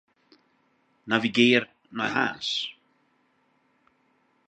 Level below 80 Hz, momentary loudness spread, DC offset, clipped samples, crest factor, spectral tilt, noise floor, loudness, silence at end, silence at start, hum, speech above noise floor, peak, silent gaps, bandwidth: -72 dBFS; 12 LU; under 0.1%; under 0.1%; 26 dB; -4 dB/octave; -68 dBFS; -25 LUFS; 1.75 s; 1.05 s; none; 44 dB; -4 dBFS; none; 8.8 kHz